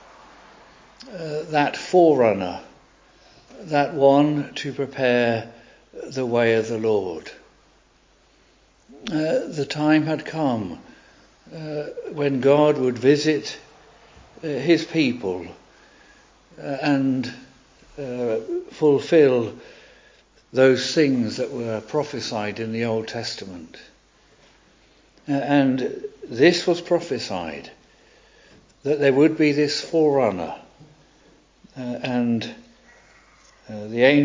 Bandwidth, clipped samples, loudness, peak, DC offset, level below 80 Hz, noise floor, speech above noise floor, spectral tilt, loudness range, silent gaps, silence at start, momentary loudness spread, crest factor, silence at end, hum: 7.6 kHz; under 0.1%; -21 LUFS; -4 dBFS; under 0.1%; -60 dBFS; -58 dBFS; 37 dB; -6 dB/octave; 7 LU; none; 1 s; 18 LU; 20 dB; 0 s; none